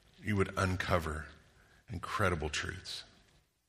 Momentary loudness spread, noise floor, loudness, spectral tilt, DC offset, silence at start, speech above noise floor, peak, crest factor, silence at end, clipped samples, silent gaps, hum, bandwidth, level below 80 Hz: 12 LU; -68 dBFS; -35 LUFS; -5 dB/octave; under 0.1%; 0.2 s; 34 dB; -12 dBFS; 24 dB; 0.65 s; under 0.1%; none; none; 15 kHz; -52 dBFS